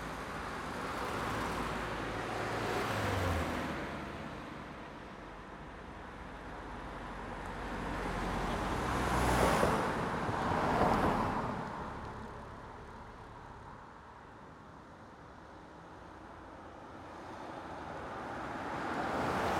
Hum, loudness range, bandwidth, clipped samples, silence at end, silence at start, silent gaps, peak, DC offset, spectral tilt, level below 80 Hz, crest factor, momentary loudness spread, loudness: none; 19 LU; 18 kHz; under 0.1%; 0 s; 0 s; none; -16 dBFS; under 0.1%; -5.5 dB/octave; -50 dBFS; 22 dB; 20 LU; -36 LUFS